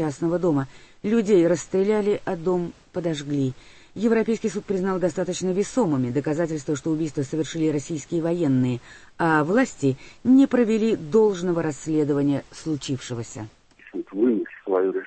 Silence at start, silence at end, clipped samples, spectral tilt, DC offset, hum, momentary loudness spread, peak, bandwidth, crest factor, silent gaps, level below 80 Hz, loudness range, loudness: 0 s; 0 s; under 0.1%; -6.5 dB/octave; under 0.1%; none; 10 LU; -6 dBFS; 8.8 kHz; 16 dB; none; -56 dBFS; 4 LU; -23 LUFS